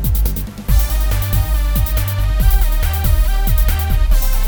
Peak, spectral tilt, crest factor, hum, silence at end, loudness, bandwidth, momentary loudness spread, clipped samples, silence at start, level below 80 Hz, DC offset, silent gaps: -2 dBFS; -5 dB/octave; 12 dB; none; 0 s; -17 LUFS; over 20 kHz; 3 LU; under 0.1%; 0 s; -14 dBFS; under 0.1%; none